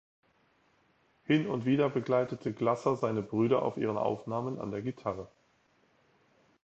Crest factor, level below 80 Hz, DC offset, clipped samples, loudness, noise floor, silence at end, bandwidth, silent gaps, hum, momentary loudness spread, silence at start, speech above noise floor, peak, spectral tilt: 20 dB; -68 dBFS; under 0.1%; under 0.1%; -31 LUFS; -69 dBFS; 1.4 s; 8.2 kHz; none; none; 9 LU; 1.3 s; 39 dB; -14 dBFS; -8 dB/octave